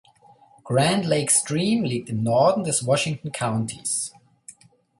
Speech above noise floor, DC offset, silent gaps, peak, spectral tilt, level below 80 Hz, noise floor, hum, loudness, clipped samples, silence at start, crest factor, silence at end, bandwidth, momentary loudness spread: 32 dB; under 0.1%; none; -6 dBFS; -4 dB/octave; -60 dBFS; -54 dBFS; none; -22 LUFS; under 0.1%; 0.65 s; 18 dB; 0.5 s; 12 kHz; 8 LU